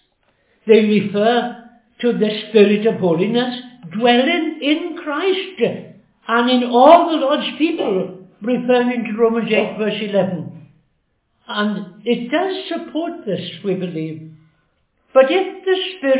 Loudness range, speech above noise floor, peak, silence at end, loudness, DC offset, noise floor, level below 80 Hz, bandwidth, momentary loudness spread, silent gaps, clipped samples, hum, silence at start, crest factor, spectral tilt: 7 LU; 50 dB; 0 dBFS; 0 s; -17 LUFS; under 0.1%; -66 dBFS; -66 dBFS; 4 kHz; 13 LU; none; under 0.1%; none; 0.65 s; 18 dB; -9.5 dB/octave